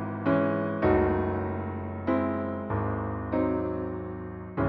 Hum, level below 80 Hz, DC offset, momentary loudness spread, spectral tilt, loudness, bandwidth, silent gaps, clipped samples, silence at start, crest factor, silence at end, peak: none; -46 dBFS; under 0.1%; 10 LU; -8 dB/octave; -29 LUFS; 5.2 kHz; none; under 0.1%; 0 s; 16 dB; 0 s; -12 dBFS